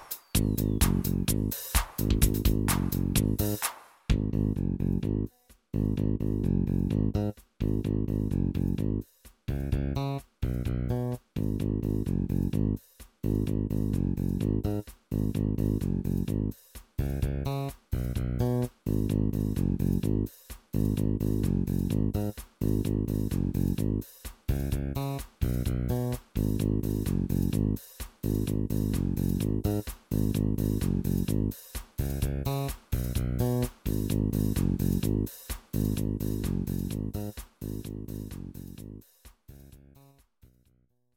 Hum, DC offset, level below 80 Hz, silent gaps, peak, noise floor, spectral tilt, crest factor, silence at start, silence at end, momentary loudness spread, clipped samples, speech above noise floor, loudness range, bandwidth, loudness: none; under 0.1%; -36 dBFS; none; -8 dBFS; -69 dBFS; -6.5 dB/octave; 22 dB; 0 s; 1.4 s; 9 LU; under 0.1%; 42 dB; 4 LU; 17 kHz; -30 LUFS